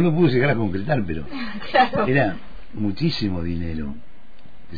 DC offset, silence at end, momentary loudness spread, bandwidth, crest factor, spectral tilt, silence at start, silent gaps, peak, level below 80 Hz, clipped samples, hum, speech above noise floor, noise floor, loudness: 4%; 0 s; 14 LU; 5 kHz; 16 dB; -8.5 dB/octave; 0 s; none; -6 dBFS; -42 dBFS; under 0.1%; none; 28 dB; -49 dBFS; -22 LUFS